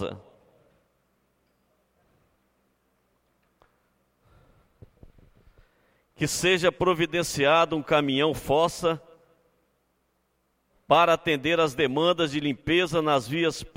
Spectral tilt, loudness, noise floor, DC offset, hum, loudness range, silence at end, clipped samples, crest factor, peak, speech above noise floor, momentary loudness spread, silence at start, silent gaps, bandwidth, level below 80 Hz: -4.5 dB/octave; -24 LUFS; -72 dBFS; under 0.1%; none; 5 LU; 0.1 s; under 0.1%; 22 dB; -6 dBFS; 48 dB; 8 LU; 0 s; none; 16.5 kHz; -56 dBFS